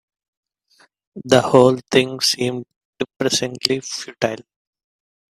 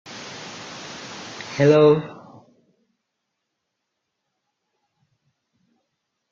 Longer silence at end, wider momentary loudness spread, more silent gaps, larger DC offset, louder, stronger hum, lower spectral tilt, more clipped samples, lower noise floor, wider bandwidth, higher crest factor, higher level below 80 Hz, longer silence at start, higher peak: second, 0.9 s vs 4.2 s; second, 15 LU vs 21 LU; first, 2.76-2.93 s, 3.16-3.20 s vs none; neither; about the same, -18 LUFS vs -17 LUFS; neither; second, -4 dB/octave vs -6 dB/octave; neither; second, -57 dBFS vs -79 dBFS; first, 15 kHz vs 7.6 kHz; about the same, 20 dB vs 22 dB; first, -60 dBFS vs -68 dBFS; first, 1.15 s vs 0.1 s; first, 0 dBFS vs -4 dBFS